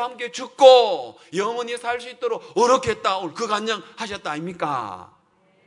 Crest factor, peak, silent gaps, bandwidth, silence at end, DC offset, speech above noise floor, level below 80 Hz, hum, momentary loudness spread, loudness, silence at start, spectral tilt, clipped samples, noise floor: 22 dB; 0 dBFS; none; 11 kHz; 0.65 s; under 0.1%; 39 dB; -62 dBFS; none; 17 LU; -21 LUFS; 0 s; -3.5 dB/octave; under 0.1%; -60 dBFS